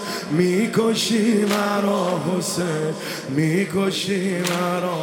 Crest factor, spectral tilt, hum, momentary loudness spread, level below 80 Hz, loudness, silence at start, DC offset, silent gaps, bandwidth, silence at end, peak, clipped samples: 16 dB; -5 dB/octave; none; 5 LU; -64 dBFS; -21 LUFS; 0 s; under 0.1%; none; 17.5 kHz; 0 s; -4 dBFS; under 0.1%